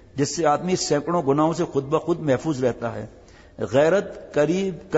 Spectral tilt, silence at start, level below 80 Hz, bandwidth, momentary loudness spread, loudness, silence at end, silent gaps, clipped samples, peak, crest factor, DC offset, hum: -5.5 dB/octave; 0.15 s; -54 dBFS; 8 kHz; 9 LU; -22 LUFS; 0 s; none; under 0.1%; -8 dBFS; 16 dB; under 0.1%; none